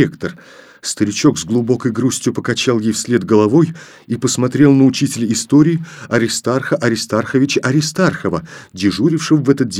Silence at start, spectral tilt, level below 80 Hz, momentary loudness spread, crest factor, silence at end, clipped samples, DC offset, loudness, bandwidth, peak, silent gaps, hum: 0 s; -5 dB/octave; -52 dBFS; 9 LU; 14 dB; 0 s; under 0.1%; under 0.1%; -15 LUFS; 15.5 kHz; 0 dBFS; none; none